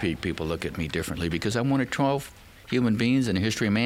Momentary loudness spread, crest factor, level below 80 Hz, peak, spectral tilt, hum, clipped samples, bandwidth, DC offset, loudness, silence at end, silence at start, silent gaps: 7 LU; 16 dB; -50 dBFS; -10 dBFS; -5.5 dB/octave; none; under 0.1%; 16 kHz; under 0.1%; -26 LUFS; 0 s; 0 s; none